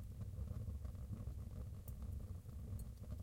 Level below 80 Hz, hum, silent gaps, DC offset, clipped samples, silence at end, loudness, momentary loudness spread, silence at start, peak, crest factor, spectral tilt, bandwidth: -52 dBFS; none; none; under 0.1%; under 0.1%; 0 s; -50 LUFS; 3 LU; 0 s; -34 dBFS; 14 dB; -8 dB/octave; 16.5 kHz